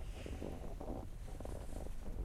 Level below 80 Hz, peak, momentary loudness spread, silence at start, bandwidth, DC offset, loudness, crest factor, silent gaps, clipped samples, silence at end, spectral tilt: -46 dBFS; -30 dBFS; 2 LU; 0 s; 15 kHz; under 0.1%; -49 LUFS; 14 dB; none; under 0.1%; 0 s; -6.5 dB/octave